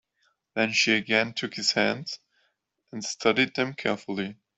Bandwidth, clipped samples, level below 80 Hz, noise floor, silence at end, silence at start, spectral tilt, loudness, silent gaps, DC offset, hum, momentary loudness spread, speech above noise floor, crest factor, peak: 8.2 kHz; under 0.1%; -68 dBFS; -73 dBFS; 0.25 s; 0.55 s; -3 dB/octave; -25 LUFS; none; under 0.1%; none; 14 LU; 47 dB; 24 dB; -4 dBFS